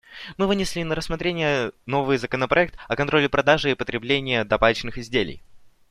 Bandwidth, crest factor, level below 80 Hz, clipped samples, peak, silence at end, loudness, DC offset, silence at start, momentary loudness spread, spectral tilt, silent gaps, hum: 15 kHz; 20 dB; -44 dBFS; under 0.1%; -2 dBFS; 0.25 s; -22 LUFS; under 0.1%; 0.1 s; 7 LU; -5 dB/octave; none; none